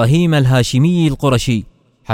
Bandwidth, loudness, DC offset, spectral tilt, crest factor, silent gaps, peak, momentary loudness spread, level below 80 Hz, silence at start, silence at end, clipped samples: 15.5 kHz; -14 LUFS; under 0.1%; -6.5 dB/octave; 14 dB; none; 0 dBFS; 5 LU; -36 dBFS; 0 s; 0 s; under 0.1%